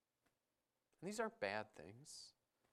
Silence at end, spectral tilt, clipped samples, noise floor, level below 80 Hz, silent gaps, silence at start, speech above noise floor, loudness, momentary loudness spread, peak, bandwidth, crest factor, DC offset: 0.4 s; -3.5 dB/octave; under 0.1%; under -90 dBFS; -88 dBFS; none; 1 s; over 42 dB; -48 LUFS; 14 LU; -26 dBFS; 14.5 kHz; 24 dB; under 0.1%